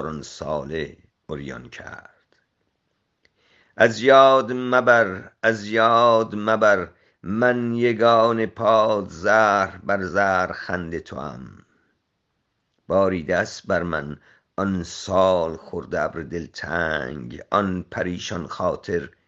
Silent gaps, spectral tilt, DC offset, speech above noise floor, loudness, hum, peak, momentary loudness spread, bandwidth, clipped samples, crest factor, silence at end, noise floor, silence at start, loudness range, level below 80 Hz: none; -5.5 dB/octave; under 0.1%; 53 dB; -21 LUFS; none; 0 dBFS; 17 LU; 8 kHz; under 0.1%; 22 dB; 0.2 s; -74 dBFS; 0 s; 9 LU; -56 dBFS